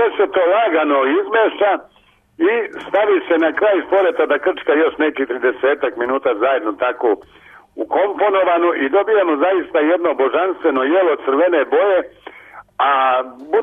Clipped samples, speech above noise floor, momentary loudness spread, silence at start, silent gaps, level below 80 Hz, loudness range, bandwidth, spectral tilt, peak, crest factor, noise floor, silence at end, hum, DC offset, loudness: under 0.1%; 25 dB; 5 LU; 0 s; none; -62 dBFS; 2 LU; 3.8 kHz; -6 dB/octave; -6 dBFS; 10 dB; -40 dBFS; 0 s; none; under 0.1%; -16 LUFS